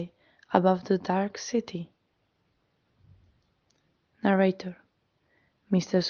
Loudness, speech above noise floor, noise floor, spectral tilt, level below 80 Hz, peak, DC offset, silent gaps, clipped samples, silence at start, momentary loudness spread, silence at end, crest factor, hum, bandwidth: -27 LUFS; 48 dB; -73 dBFS; -6 dB/octave; -70 dBFS; -4 dBFS; under 0.1%; none; under 0.1%; 0 s; 16 LU; 0 s; 26 dB; none; 7 kHz